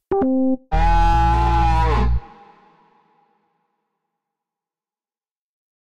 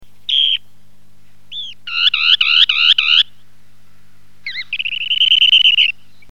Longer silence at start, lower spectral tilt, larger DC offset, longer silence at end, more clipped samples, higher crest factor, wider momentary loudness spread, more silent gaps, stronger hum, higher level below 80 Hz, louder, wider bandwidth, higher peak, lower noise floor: about the same, 0 s vs 0 s; first, -7.5 dB/octave vs 2 dB/octave; second, under 0.1% vs 2%; second, 0.25 s vs 0.4 s; neither; about the same, 14 dB vs 16 dB; second, 4 LU vs 19 LU; first, 5.31-5.42 s vs none; second, none vs 50 Hz at -55 dBFS; first, -24 dBFS vs -64 dBFS; second, -19 LUFS vs -11 LUFS; second, 8.2 kHz vs 11 kHz; second, -6 dBFS vs 0 dBFS; first, under -90 dBFS vs -54 dBFS